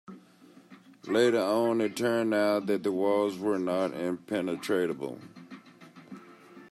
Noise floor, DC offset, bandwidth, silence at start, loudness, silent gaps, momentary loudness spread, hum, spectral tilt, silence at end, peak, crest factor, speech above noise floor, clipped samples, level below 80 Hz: -56 dBFS; under 0.1%; 14 kHz; 0.1 s; -28 LUFS; none; 23 LU; none; -5.5 dB/octave; 0.05 s; -12 dBFS; 18 dB; 28 dB; under 0.1%; -78 dBFS